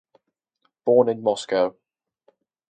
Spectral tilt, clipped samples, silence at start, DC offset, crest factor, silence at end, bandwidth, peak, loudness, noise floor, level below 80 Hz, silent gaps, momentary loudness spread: -5.5 dB/octave; under 0.1%; 0.85 s; under 0.1%; 20 dB; 1 s; 9.4 kHz; -4 dBFS; -22 LUFS; -72 dBFS; -72 dBFS; none; 8 LU